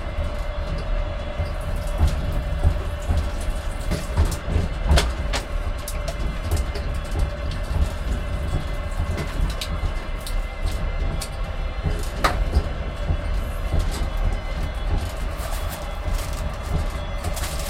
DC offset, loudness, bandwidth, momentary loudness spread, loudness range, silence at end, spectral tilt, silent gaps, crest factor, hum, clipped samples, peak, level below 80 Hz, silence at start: under 0.1%; -27 LUFS; 16 kHz; 6 LU; 3 LU; 0 s; -5 dB/octave; none; 20 dB; none; under 0.1%; -4 dBFS; -24 dBFS; 0 s